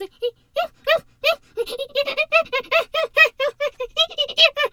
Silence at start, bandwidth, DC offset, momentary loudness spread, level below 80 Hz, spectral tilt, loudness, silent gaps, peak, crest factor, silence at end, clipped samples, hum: 0 s; 18.5 kHz; under 0.1%; 12 LU; -56 dBFS; -0.5 dB/octave; -20 LUFS; none; -2 dBFS; 20 dB; 0.05 s; under 0.1%; none